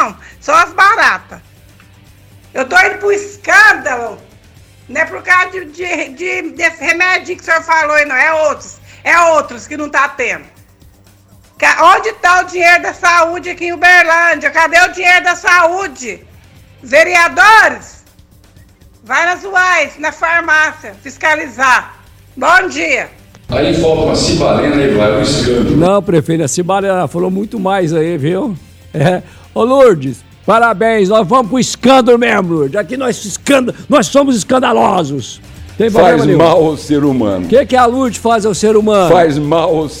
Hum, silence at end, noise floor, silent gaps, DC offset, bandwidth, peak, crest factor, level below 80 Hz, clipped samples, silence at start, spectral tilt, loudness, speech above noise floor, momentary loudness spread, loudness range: none; 0 s; -43 dBFS; none; under 0.1%; 18 kHz; 0 dBFS; 12 dB; -40 dBFS; 0.2%; 0 s; -4.5 dB/octave; -10 LUFS; 33 dB; 11 LU; 4 LU